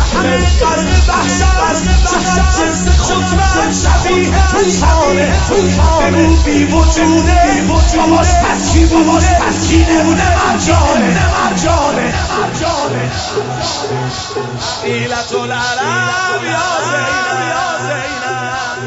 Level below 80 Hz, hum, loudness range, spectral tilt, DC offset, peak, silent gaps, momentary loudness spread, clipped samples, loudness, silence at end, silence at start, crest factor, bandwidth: -16 dBFS; none; 6 LU; -4.5 dB/octave; under 0.1%; 0 dBFS; none; 7 LU; under 0.1%; -12 LUFS; 0 s; 0 s; 12 dB; 8 kHz